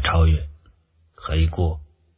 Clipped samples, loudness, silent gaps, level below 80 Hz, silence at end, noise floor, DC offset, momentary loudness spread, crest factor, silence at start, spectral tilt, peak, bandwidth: under 0.1%; -22 LUFS; none; -24 dBFS; 0.35 s; -58 dBFS; under 0.1%; 18 LU; 18 dB; 0 s; -10.5 dB/octave; -4 dBFS; 4 kHz